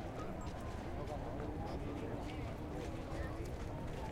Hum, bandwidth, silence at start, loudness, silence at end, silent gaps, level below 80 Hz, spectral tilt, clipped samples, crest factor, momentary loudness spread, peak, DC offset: none; 16 kHz; 0 s; -45 LUFS; 0 s; none; -50 dBFS; -7 dB/octave; under 0.1%; 14 dB; 2 LU; -30 dBFS; under 0.1%